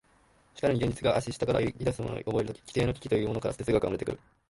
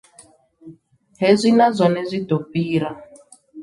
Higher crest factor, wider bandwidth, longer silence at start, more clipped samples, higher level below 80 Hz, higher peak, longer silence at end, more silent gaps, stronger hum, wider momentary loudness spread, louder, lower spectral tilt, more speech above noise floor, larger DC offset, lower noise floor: about the same, 18 dB vs 18 dB; about the same, 11.5 kHz vs 11.5 kHz; about the same, 0.55 s vs 0.65 s; neither; first, -50 dBFS vs -62 dBFS; second, -12 dBFS vs -2 dBFS; first, 0.35 s vs 0 s; neither; neither; second, 5 LU vs 9 LU; second, -30 LUFS vs -18 LUFS; about the same, -6.5 dB/octave vs -6.5 dB/octave; about the same, 34 dB vs 33 dB; neither; first, -64 dBFS vs -51 dBFS